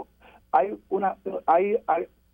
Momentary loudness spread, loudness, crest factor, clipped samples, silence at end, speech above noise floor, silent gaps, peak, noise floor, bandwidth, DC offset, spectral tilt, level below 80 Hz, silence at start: 6 LU; -25 LUFS; 18 dB; under 0.1%; 0.25 s; 30 dB; none; -8 dBFS; -55 dBFS; 4 kHz; under 0.1%; -8.5 dB/octave; -64 dBFS; 0 s